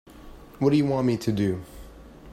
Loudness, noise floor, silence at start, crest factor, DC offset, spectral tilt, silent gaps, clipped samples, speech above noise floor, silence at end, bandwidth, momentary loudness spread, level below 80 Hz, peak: -25 LUFS; -45 dBFS; 0.15 s; 18 dB; under 0.1%; -7.5 dB/octave; none; under 0.1%; 22 dB; 0 s; 15 kHz; 19 LU; -48 dBFS; -8 dBFS